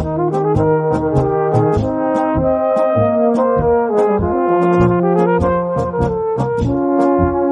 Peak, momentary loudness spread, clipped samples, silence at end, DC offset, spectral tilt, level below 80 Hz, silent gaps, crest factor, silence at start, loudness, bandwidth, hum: -2 dBFS; 4 LU; under 0.1%; 0 s; under 0.1%; -9.5 dB/octave; -34 dBFS; none; 14 dB; 0 s; -15 LUFS; 9.8 kHz; none